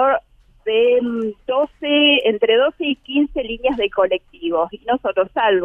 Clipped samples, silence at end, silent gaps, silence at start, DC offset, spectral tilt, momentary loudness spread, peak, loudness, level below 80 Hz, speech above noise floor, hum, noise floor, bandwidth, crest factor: under 0.1%; 0 s; none; 0 s; under 0.1%; -6 dB/octave; 9 LU; -2 dBFS; -18 LUFS; -48 dBFS; 22 dB; none; -40 dBFS; 3.7 kHz; 16 dB